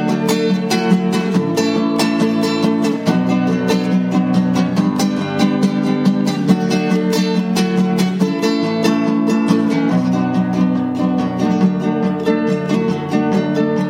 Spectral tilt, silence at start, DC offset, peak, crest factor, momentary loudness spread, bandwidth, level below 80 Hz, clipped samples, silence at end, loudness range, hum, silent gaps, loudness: -6.5 dB/octave; 0 s; under 0.1%; 0 dBFS; 14 dB; 2 LU; 16 kHz; -56 dBFS; under 0.1%; 0 s; 1 LU; none; none; -16 LUFS